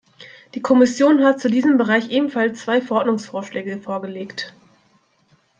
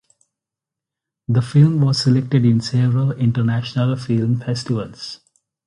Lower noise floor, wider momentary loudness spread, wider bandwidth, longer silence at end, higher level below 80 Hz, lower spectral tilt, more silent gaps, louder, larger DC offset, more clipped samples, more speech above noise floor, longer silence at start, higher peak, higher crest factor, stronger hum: second, -60 dBFS vs -86 dBFS; about the same, 15 LU vs 14 LU; second, 8.8 kHz vs 10.5 kHz; first, 1.1 s vs 0.5 s; second, -68 dBFS vs -54 dBFS; second, -5 dB/octave vs -7 dB/octave; neither; about the same, -18 LUFS vs -18 LUFS; neither; neither; second, 42 dB vs 69 dB; second, 0.2 s vs 1.3 s; about the same, -2 dBFS vs -2 dBFS; about the same, 18 dB vs 16 dB; neither